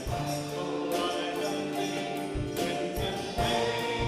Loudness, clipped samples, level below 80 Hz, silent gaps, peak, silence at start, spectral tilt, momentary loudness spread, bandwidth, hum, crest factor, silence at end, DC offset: -31 LUFS; under 0.1%; -46 dBFS; none; -16 dBFS; 0 s; -4.5 dB/octave; 5 LU; 16 kHz; none; 14 dB; 0 s; under 0.1%